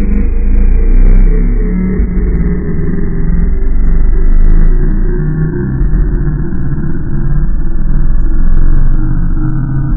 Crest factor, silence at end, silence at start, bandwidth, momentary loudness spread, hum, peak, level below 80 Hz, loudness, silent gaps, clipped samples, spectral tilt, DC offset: 6 dB; 0 s; 0 s; 2.5 kHz; 4 LU; none; 0 dBFS; -8 dBFS; -15 LUFS; none; under 0.1%; -13 dB/octave; under 0.1%